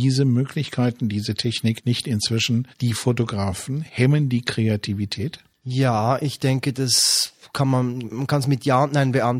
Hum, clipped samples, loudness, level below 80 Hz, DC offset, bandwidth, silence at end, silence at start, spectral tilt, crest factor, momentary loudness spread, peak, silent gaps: none; under 0.1%; -21 LUFS; -56 dBFS; under 0.1%; 16 kHz; 0 s; 0 s; -5 dB/octave; 18 dB; 8 LU; -4 dBFS; none